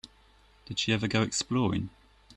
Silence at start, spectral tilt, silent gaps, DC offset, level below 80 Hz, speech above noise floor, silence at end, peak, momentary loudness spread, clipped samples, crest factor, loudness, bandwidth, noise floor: 0.05 s; -4.5 dB/octave; none; under 0.1%; -56 dBFS; 31 dB; 0.05 s; -12 dBFS; 9 LU; under 0.1%; 20 dB; -29 LUFS; 10.5 kHz; -60 dBFS